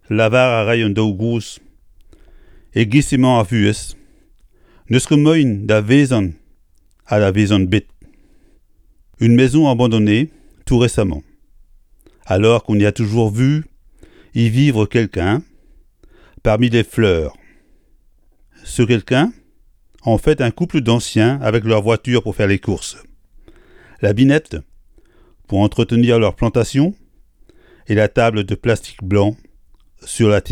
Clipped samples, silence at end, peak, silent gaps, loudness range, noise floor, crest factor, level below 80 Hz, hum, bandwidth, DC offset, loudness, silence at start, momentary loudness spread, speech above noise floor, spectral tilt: under 0.1%; 0 s; 0 dBFS; none; 4 LU; -53 dBFS; 16 dB; -38 dBFS; none; 13 kHz; under 0.1%; -16 LUFS; 0.1 s; 9 LU; 38 dB; -6.5 dB/octave